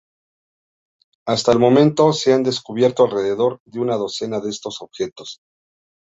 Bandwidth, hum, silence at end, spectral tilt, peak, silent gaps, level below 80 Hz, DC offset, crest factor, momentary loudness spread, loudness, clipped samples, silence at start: 8 kHz; none; 0.75 s; -5.5 dB/octave; -2 dBFS; 3.60-3.66 s; -58 dBFS; under 0.1%; 18 dB; 15 LU; -18 LUFS; under 0.1%; 1.25 s